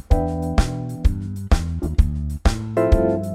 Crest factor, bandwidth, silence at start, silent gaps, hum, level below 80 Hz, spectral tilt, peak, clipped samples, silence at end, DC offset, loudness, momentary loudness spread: 16 dB; 13.5 kHz; 0.1 s; none; none; -22 dBFS; -7 dB/octave; -4 dBFS; under 0.1%; 0 s; under 0.1%; -22 LUFS; 5 LU